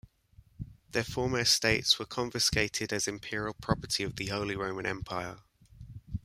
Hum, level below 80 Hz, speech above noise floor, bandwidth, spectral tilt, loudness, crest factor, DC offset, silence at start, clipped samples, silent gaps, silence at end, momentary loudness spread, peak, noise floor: none; -52 dBFS; 29 dB; 16 kHz; -3 dB/octave; -30 LUFS; 22 dB; under 0.1%; 0.6 s; under 0.1%; none; 0.05 s; 18 LU; -10 dBFS; -61 dBFS